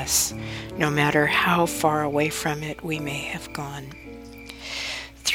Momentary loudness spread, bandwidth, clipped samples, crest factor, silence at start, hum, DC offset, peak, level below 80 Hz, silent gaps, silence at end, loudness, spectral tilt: 18 LU; over 20 kHz; under 0.1%; 22 dB; 0 s; none; under 0.1%; -4 dBFS; -48 dBFS; none; 0 s; -24 LUFS; -3.5 dB/octave